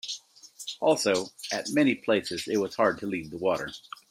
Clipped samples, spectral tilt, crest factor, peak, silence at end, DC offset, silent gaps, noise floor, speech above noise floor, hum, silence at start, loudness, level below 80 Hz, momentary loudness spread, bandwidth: under 0.1%; -4 dB/octave; 18 dB; -10 dBFS; 0.3 s; under 0.1%; none; -49 dBFS; 22 dB; none; 0.05 s; -27 LUFS; -68 dBFS; 14 LU; 16 kHz